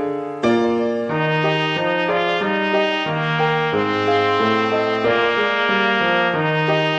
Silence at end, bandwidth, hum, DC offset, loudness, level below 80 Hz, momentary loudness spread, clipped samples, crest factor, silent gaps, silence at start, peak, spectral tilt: 0 s; 8.4 kHz; none; under 0.1%; -18 LUFS; -60 dBFS; 3 LU; under 0.1%; 14 dB; none; 0 s; -4 dBFS; -6 dB/octave